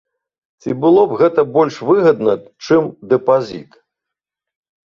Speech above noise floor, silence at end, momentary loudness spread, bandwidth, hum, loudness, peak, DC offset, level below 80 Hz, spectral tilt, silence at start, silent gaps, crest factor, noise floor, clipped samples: 69 dB; 1.35 s; 12 LU; 7.2 kHz; none; -15 LUFS; 0 dBFS; under 0.1%; -60 dBFS; -7.5 dB/octave; 0.65 s; none; 16 dB; -83 dBFS; under 0.1%